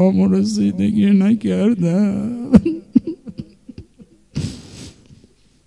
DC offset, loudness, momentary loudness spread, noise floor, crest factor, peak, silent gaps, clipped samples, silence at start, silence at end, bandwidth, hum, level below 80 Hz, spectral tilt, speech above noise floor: under 0.1%; -17 LUFS; 21 LU; -52 dBFS; 18 dB; 0 dBFS; none; 0.1%; 0 s; 0.75 s; 11 kHz; none; -44 dBFS; -8 dB/octave; 37 dB